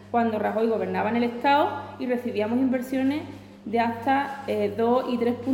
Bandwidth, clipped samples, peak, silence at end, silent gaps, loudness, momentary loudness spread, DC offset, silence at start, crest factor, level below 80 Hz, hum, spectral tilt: 17 kHz; under 0.1%; -10 dBFS; 0 s; none; -25 LUFS; 7 LU; under 0.1%; 0 s; 14 dB; -64 dBFS; 50 Hz at -45 dBFS; -6.5 dB/octave